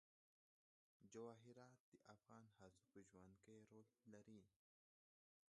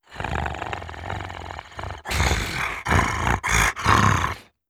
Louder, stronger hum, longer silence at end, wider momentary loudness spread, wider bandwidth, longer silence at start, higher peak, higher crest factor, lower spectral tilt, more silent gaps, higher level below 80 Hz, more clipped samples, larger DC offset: second, -66 LUFS vs -23 LUFS; neither; first, 1 s vs 0.25 s; second, 9 LU vs 16 LU; second, 9.4 kHz vs 18.5 kHz; first, 1 s vs 0.1 s; second, -46 dBFS vs -2 dBFS; about the same, 22 dB vs 20 dB; first, -6 dB/octave vs -4 dB/octave; first, 1.80-1.92 s vs none; second, under -90 dBFS vs -32 dBFS; neither; neither